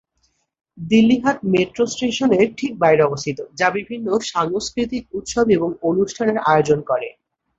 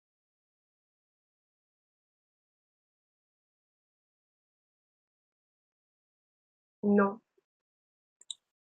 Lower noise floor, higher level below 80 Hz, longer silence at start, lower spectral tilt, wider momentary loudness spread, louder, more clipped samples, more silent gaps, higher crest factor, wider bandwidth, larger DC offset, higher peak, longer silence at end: second, -67 dBFS vs under -90 dBFS; first, -52 dBFS vs under -90 dBFS; second, 0.75 s vs 6.85 s; about the same, -5 dB/octave vs -6 dB/octave; second, 9 LU vs 18 LU; first, -19 LUFS vs -29 LUFS; neither; neither; second, 16 dB vs 26 dB; first, 8 kHz vs 7 kHz; neither; first, -2 dBFS vs -14 dBFS; second, 0.5 s vs 1.6 s